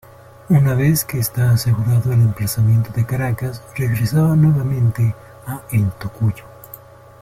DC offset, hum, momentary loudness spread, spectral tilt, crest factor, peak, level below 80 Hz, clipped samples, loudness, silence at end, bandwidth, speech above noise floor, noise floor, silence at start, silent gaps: under 0.1%; none; 16 LU; -6.5 dB/octave; 14 dB; -4 dBFS; -44 dBFS; under 0.1%; -17 LUFS; 0.45 s; 16 kHz; 24 dB; -40 dBFS; 0.5 s; none